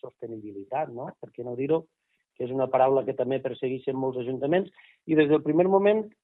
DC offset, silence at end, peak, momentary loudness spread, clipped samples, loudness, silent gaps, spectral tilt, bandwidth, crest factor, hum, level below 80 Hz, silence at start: under 0.1%; 0.15 s; -8 dBFS; 17 LU; under 0.1%; -26 LUFS; none; -10.5 dB/octave; 4.1 kHz; 18 dB; none; -72 dBFS; 0.05 s